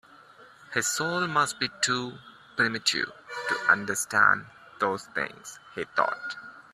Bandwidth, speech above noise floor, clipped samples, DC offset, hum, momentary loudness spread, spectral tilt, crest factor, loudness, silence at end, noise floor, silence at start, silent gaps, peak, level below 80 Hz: 15 kHz; 25 dB; under 0.1%; under 0.1%; none; 14 LU; -2 dB/octave; 22 dB; -27 LUFS; 0.1 s; -53 dBFS; 0.4 s; none; -6 dBFS; -70 dBFS